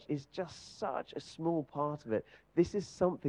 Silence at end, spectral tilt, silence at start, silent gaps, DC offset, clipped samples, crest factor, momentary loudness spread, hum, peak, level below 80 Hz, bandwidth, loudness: 0 s; -7 dB/octave; 0.1 s; none; under 0.1%; under 0.1%; 20 dB; 10 LU; none; -16 dBFS; -66 dBFS; 10 kHz; -37 LUFS